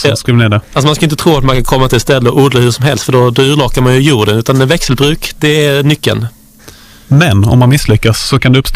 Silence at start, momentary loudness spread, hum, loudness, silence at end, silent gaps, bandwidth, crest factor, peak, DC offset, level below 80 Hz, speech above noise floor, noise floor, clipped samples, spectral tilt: 0 s; 4 LU; none; -9 LUFS; 0 s; none; 16 kHz; 8 dB; 0 dBFS; under 0.1%; -24 dBFS; 28 dB; -36 dBFS; 0.6%; -5.5 dB/octave